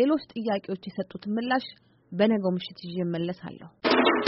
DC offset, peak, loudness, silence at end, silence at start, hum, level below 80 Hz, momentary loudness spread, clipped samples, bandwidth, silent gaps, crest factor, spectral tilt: under 0.1%; -8 dBFS; -28 LUFS; 0 s; 0 s; none; -68 dBFS; 13 LU; under 0.1%; 5.8 kHz; none; 20 dB; -4 dB/octave